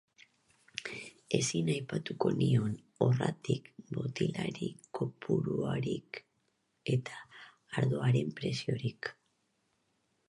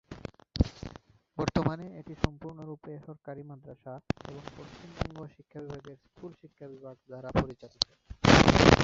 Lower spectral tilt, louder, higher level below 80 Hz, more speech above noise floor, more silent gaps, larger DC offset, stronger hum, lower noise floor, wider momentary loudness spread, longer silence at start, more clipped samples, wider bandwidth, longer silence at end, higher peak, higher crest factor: about the same, -6 dB/octave vs -5.5 dB/octave; second, -34 LUFS vs -28 LUFS; second, -68 dBFS vs -42 dBFS; first, 45 dB vs 16 dB; neither; neither; neither; first, -77 dBFS vs -52 dBFS; second, 13 LU vs 25 LU; first, 0.75 s vs 0.1 s; neither; first, 11.5 kHz vs 8 kHz; first, 1.15 s vs 0 s; second, -14 dBFS vs -2 dBFS; second, 22 dB vs 28 dB